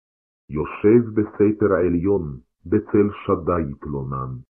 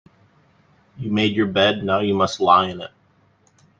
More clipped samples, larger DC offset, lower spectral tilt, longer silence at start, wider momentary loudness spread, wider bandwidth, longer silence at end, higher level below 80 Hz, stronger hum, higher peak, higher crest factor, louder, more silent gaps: neither; neither; first, -12.5 dB/octave vs -5.5 dB/octave; second, 0.5 s vs 1 s; second, 12 LU vs 16 LU; second, 3.3 kHz vs 7.8 kHz; second, 0.1 s vs 0.95 s; first, -44 dBFS vs -60 dBFS; neither; about the same, -4 dBFS vs -2 dBFS; about the same, 16 dB vs 20 dB; about the same, -21 LUFS vs -19 LUFS; neither